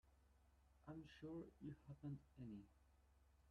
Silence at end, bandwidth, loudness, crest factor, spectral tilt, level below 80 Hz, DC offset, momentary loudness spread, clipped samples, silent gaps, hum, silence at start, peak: 0 s; 9 kHz; -58 LUFS; 16 dB; -8 dB/octave; -74 dBFS; under 0.1%; 5 LU; under 0.1%; none; none; 0.05 s; -44 dBFS